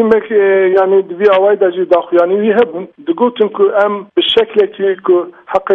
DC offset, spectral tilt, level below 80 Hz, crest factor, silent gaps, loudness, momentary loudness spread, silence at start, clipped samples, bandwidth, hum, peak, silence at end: under 0.1%; -7 dB/octave; -56 dBFS; 12 dB; none; -12 LUFS; 5 LU; 0 s; under 0.1%; 4.5 kHz; none; 0 dBFS; 0 s